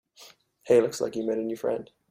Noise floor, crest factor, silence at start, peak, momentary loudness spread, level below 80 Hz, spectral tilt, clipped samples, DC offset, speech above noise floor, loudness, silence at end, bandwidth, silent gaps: -54 dBFS; 18 dB; 0.2 s; -10 dBFS; 8 LU; -68 dBFS; -5 dB/octave; under 0.1%; under 0.1%; 28 dB; -27 LUFS; 0.25 s; 15.5 kHz; none